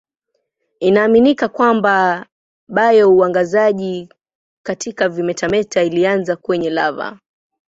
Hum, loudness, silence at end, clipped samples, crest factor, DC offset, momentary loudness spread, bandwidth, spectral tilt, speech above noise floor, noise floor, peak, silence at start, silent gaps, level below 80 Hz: none; -15 LUFS; 0.65 s; under 0.1%; 14 dB; under 0.1%; 14 LU; 7.8 kHz; -5.5 dB/octave; 57 dB; -71 dBFS; -2 dBFS; 0.8 s; 2.32-2.67 s, 4.35-4.64 s; -56 dBFS